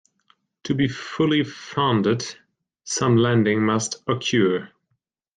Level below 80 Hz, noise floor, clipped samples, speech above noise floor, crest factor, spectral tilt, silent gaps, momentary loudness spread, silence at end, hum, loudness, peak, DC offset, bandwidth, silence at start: -60 dBFS; -74 dBFS; under 0.1%; 53 dB; 16 dB; -5 dB/octave; none; 9 LU; 0.7 s; none; -22 LUFS; -8 dBFS; under 0.1%; 9.6 kHz; 0.65 s